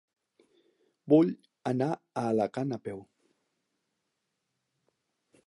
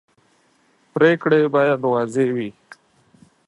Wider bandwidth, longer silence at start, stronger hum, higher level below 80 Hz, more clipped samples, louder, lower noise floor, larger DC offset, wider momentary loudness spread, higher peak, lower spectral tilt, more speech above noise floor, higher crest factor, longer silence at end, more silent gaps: about the same, 11 kHz vs 11 kHz; about the same, 1.05 s vs 0.95 s; neither; second, -76 dBFS vs -70 dBFS; neither; second, -29 LUFS vs -18 LUFS; first, -82 dBFS vs -60 dBFS; neither; about the same, 14 LU vs 12 LU; second, -10 dBFS vs -2 dBFS; first, -8.5 dB/octave vs -7 dB/octave; first, 54 dB vs 43 dB; about the same, 22 dB vs 18 dB; first, 2.45 s vs 0.95 s; neither